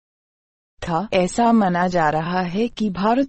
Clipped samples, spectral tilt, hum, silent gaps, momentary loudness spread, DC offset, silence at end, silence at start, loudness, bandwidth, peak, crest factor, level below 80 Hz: under 0.1%; -6 dB/octave; none; none; 8 LU; under 0.1%; 0 s; 0.8 s; -20 LUFS; 8.8 kHz; -6 dBFS; 16 dB; -48 dBFS